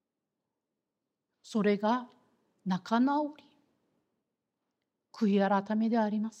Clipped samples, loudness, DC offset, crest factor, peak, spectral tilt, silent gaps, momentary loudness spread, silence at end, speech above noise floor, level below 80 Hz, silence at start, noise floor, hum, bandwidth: under 0.1%; -30 LUFS; under 0.1%; 20 dB; -14 dBFS; -7 dB/octave; none; 8 LU; 0.1 s; 58 dB; -88 dBFS; 1.45 s; -87 dBFS; none; 8.6 kHz